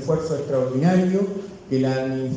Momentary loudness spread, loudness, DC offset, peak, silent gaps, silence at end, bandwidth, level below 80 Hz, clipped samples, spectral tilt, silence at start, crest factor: 8 LU; -22 LUFS; under 0.1%; -6 dBFS; none; 0 s; 9 kHz; -56 dBFS; under 0.1%; -8 dB/octave; 0 s; 14 dB